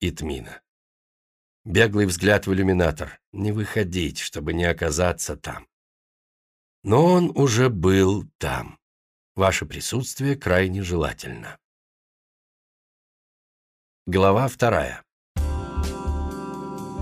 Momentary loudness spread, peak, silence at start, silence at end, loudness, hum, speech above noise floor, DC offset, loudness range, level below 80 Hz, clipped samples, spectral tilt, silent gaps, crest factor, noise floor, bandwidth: 16 LU; -6 dBFS; 0 s; 0 s; -22 LUFS; none; over 68 dB; under 0.1%; 6 LU; -38 dBFS; under 0.1%; -5.5 dB/octave; 0.68-1.64 s, 3.27-3.33 s, 5.73-6.82 s, 8.35-8.39 s, 8.82-9.35 s, 11.65-14.06 s, 15.12-15.35 s; 18 dB; under -90 dBFS; 15.5 kHz